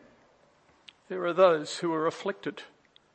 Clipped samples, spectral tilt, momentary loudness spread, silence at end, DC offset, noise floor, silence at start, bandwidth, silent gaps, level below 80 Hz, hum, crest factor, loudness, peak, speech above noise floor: under 0.1%; -5 dB/octave; 16 LU; 0.5 s; under 0.1%; -63 dBFS; 1.1 s; 8.8 kHz; none; -82 dBFS; none; 22 dB; -28 LUFS; -8 dBFS; 36 dB